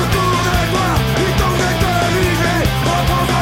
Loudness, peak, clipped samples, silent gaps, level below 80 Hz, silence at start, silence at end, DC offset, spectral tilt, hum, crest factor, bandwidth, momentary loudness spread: -15 LUFS; -4 dBFS; under 0.1%; none; -24 dBFS; 0 s; 0 s; under 0.1%; -5 dB/octave; none; 10 dB; 16.5 kHz; 1 LU